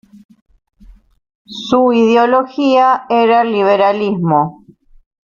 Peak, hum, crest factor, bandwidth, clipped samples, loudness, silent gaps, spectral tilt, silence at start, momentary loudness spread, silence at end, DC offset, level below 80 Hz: 0 dBFS; none; 14 dB; 7.2 kHz; under 0.1%; -12 LUFS; none; -6.5 dB/octave; 1.5 s; 6 LU; 0.8 s; under 0.1%; -52 dBFS